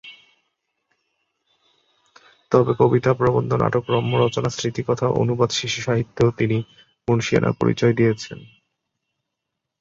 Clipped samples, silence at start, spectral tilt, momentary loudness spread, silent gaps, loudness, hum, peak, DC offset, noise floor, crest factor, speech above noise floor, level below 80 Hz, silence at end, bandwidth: under 0.1%; 0.05 s; -6 dB/octave; 8 LU; none; -20 LUFS; none; -2 dBFS; under 0.1%; -81 dBFS; 20 dB; 61 dB; -52 dBFS; 1.35 s; 7.8 kHz